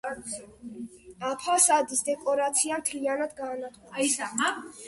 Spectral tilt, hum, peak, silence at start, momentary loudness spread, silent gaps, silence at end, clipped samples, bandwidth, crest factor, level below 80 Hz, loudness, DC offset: -1 dB/octave; none; -8 dBFS; 0.05 s; 19 LU; none; 0 s; under 0.1%; 12 kHz; 20 dB; -68 dBFS; -26 LUFS; under 0.1%